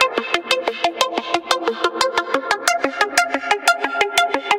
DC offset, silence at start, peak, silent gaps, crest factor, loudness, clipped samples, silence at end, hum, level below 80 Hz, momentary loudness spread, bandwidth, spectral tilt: under 0.1%; 0 s; 0 dBFS; none; 20 dB; -19 LUFS; under 0.1%; 0 s; none; -60 dBFS; 4 LU; 17 kHz; -0.5 dB/octave